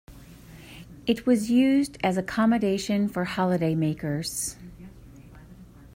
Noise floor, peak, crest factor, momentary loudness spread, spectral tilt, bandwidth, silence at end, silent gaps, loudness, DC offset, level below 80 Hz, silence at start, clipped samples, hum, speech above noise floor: -48 dBFS; -10 dBFS; 16 dB; 21 LU; -5.5 dB/octave; 16 kHz; 0.1 s; none; -25 LUFS; under 0.1%; -54 dBFS; 0.1 s; under 0.1%; none; 24 dB